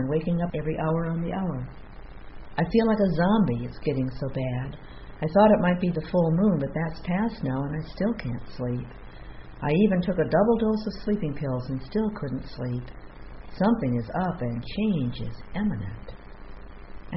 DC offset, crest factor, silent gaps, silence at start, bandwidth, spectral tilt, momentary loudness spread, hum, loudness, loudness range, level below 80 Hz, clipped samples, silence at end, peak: under 0.1%; 20 dB; none; 0 s; 5.8 kHz; -7.5 dB/octave; 23 LU; none; -26 LUFS; 5 LU; -44 dBFS; under 0.1%; 0 s; -6 dBFS